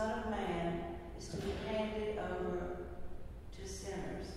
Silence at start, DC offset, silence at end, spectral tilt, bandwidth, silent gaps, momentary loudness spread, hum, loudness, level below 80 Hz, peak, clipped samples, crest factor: 0 s; under 0.1%; 0 s; -5.5 dB/octave; 15.5 kHz; none; 12 LU; none; -41 LUFS; -50 dBFS; -26 dBFS; under 0.1%; 14 dB